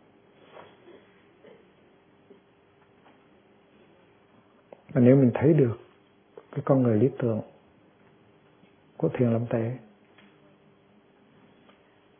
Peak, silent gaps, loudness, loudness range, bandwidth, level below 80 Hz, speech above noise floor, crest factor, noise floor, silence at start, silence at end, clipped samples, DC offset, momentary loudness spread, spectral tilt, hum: -6 dBFS; none; -24 LUFS; 8 LU; 3.6 kHz; -68 dBFS; 38 dB; 24 dB; -61 dBFS; 4.9 s; 2.4 s; under 0.1%; under 0.1%; 17 LU; -13 dB/octave; none